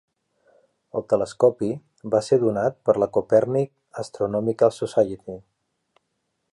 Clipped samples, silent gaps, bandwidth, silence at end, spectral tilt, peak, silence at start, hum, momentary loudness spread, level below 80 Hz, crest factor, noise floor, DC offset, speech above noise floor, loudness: under 0.1%; none; 11.5 kHz; 1.15 s; -7 dB/octave; -4 dBFS; 0.95 s; none; 14 LU; -60 dBFS; 20 dB; -75 dBFS; under 0.1%; 54 dB; -22 LUFS